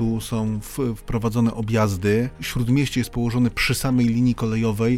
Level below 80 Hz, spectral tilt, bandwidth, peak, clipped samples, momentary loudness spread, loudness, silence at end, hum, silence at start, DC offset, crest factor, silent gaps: -38 dBFS; -6 dB/octave; 16 kHz; -8 dBFS; under 0.1%; 6 LU; -22 LUFS; 0 s; none; 0 s; under 0.1%; 14 dB; none